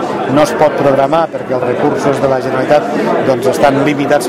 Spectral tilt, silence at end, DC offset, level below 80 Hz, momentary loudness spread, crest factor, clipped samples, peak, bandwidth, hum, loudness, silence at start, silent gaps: -6 dB/octave; 0 s; under 0.1%; -46 dBFS; 4 LU; 12 dB; 0.2%; 0 dBFS; 16 kHz; none; -12 LUFS; 0 s; none